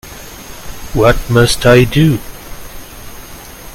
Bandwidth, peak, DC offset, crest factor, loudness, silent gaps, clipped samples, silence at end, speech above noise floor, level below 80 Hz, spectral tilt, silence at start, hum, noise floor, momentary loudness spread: 17 kHz; 0 dBFS; under 0.1%; 14 dB; -11 LUFS; none; 0.1%; 0 s; 22 dB; -28 dBFS; -5.5 dB/octave; 0.05 s; none; -31 dBFS; 23 LU